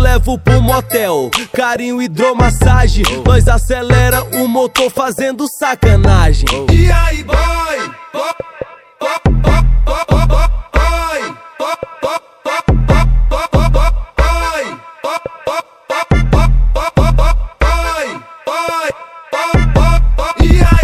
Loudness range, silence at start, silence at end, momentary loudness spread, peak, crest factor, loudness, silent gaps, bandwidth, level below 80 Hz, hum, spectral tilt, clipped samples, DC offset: 4 LU; 0 s; 0 s; 10 LU; 0 dBFS; 12 dB; -13 LUFS; none; 15 kHz; -14 dBFS; none; -5.5 dB/octave; 0.2%; under 0.1%